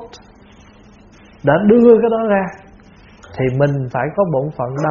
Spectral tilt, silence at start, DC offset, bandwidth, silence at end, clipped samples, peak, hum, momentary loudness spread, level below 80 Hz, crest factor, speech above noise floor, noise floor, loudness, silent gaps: -7.5 dB/octave; 0 s; under 0.1%; 7.2 kHz; 0 s; under 0.1%; 0 dBFS; none; 12 LU; -48 dBFS; 16 dB; 30 dB; -44 dBFS; -15 LUFS; none